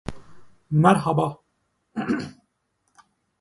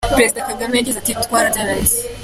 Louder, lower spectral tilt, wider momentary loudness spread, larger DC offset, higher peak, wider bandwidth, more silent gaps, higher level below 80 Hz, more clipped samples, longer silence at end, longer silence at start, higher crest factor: second, -22 LUFS vs -16 LUFS; first, -7.5 dB/octave vs -2.5 dB/octave; first, 19 LU vs 4 LU; neither; about the same, -2 dBFS vs 0 dBFS; second, 11.5 kHz vs 16 kHz; neither; second, -54 dBFS vs -34 dBFS; neither; first, 1.1 s vs 0 s; about the same, 0.05 s vs 0 s; first, 24 dB vs 16 dB